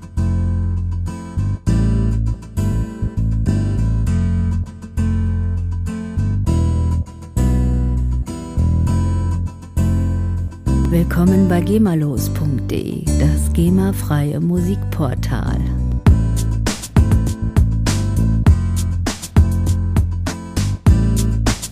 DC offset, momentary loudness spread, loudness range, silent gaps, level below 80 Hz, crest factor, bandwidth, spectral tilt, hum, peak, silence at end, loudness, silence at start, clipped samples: under 0.1%; 8 LU; 3 LU; none; -22 dBFS; 16 dB; 15.5 kHz; -7 dB/octave; none; 0 dBFS; 0 s; -18 LUFS; 0 s; under 0.1%